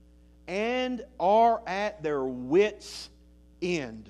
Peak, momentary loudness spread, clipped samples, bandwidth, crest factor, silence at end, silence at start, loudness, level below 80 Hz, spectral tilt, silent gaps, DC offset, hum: -12 dBFS; 17 LU; under 0.1%; 12 kHz; 16 dB; 0 s; 0.45 s; -27 LUFS; -56 dBFS; -5 dB/octave; none; under 0.1%; none